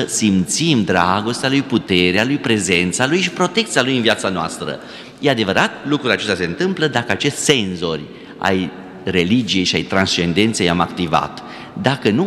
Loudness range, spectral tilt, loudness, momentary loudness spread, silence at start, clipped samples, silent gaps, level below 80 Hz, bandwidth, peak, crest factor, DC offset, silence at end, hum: 3 LU; -4 dB/octave; -17 LUFS; 9 LU; 0 s; under 0.1%; none; -54 dBFS; 14.5 kHz; 0 dBFS; 18 dB; under 0.1%; 0 s; none